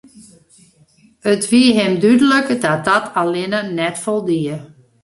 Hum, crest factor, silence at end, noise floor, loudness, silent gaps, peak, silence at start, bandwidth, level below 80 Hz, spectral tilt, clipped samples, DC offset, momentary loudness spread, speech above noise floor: none; 16 dB; 0.4 s; -52 dBFS; -16 LUFS; none; -2 dBFS; 0.15 s; 11.5 kHz; -58 dBFS; -4.5 dB/octave; under 0.1%; under 0.1%; 9 LU; 37 dB